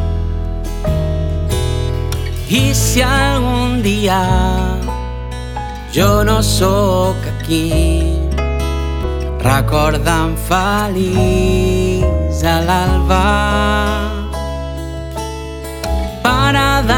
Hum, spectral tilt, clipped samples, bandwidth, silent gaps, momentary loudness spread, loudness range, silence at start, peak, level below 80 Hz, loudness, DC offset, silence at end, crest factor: none; -5 dB/octave; under 0.1%; 18 kHz; none; 11 LU; 2 LU; 0 s; 0 dBFS; -20 dBFS; -15 LUFS; under 0.1%; 0 s; 14 dB